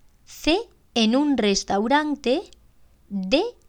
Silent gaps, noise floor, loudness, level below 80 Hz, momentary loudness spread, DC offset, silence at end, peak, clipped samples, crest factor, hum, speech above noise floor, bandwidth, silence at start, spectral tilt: none; -54 dBFS; -22 LUFS; -48 dBFS; 7 LU; under 0.1%; 0.2 s; -6 dBFS; under 0.1%; 18 dB; none; 32 dB; 16.5 kHz; 0.3 s; -4 dB/octave